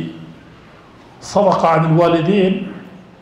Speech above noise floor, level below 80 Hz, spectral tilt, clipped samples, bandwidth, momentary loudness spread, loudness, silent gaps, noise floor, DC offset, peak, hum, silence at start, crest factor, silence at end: 29 dB; -52 dBFS; -7 dB/octave; under 0.1%; 11 kHz; 22 LU; -15 LUFS; none; -42 dBFS; under 0.1%; -2 dBFS; none; 0 s; 16 dB; 0.25 s